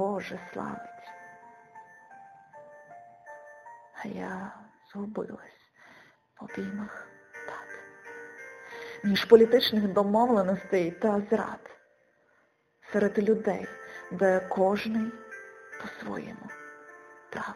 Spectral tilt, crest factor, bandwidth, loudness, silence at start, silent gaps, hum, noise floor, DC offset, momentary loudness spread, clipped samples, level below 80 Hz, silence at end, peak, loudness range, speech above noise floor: -6 dB/octave; 26 dB; 13.5 kHz; -27 LUFS; 0 s; none; none; -68 dBFS; under 0.1%; 24 LU; under 0.1%; -68 dBFS; 0 s; -4 dBFS; 19 LU; 41 dB